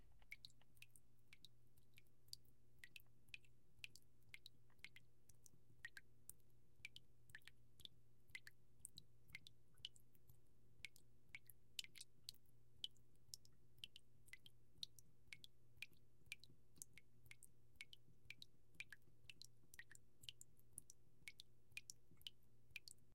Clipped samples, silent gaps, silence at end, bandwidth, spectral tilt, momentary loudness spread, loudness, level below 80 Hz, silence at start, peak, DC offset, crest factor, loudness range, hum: under 0.1%; none; 0 s; 16 kHz; -0.5 dB/octave; 10 LU; -62 LUFS; -82 dBFS; 0 s; -30 dBFS; under 0.1%; 36 dB; 5 LU; none